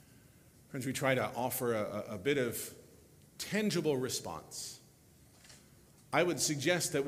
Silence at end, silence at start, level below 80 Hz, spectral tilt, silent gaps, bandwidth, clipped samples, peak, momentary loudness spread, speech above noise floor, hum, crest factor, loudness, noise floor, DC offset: 0 s; 0.7 s; -70 dBFS; -4 dB/octave; none; 16 kHz; under 0.1%; -14 dBFS; 12 LU; 28 dB; none; 22 dB; -34 LUFS; -62 dBFS; under 0.1%